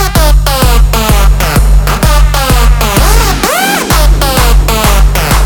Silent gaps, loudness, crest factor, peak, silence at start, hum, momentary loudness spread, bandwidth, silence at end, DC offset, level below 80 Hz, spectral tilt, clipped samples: none; -8 LUFS; 6 dB; 0 dBFS; 0 s; none; 1 LU; 19.5 kHz; 0 s; under 0.1%; -8 dBFS; -4 dB/octave; 0.4%